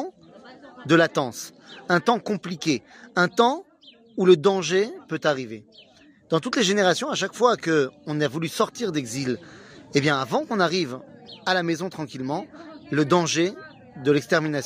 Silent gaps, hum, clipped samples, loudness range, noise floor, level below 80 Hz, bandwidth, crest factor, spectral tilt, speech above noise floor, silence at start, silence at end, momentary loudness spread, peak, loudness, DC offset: none; none; under 0.1%; 3 LU; -49 dBFS; -68 dBFS; 15.5 kHz; 20 dB; -4.5 dB/octave; 26 dB; 0 s; 0 s; 17 LU; -4 dBFS; -23 LUFS; under 0.1%